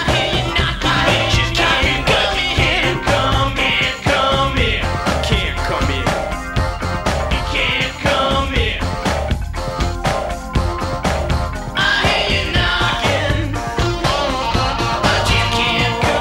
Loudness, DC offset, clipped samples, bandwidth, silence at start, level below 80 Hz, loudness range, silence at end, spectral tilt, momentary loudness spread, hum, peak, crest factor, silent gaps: -17 LUFS; under 0.1%; under 0.1%; 16 kHz; 0 s; -26 dBFS; 4 LU; 0 s; -4.5 dB/octave; 6 LU; none; -2 dBFS; 16 dB; none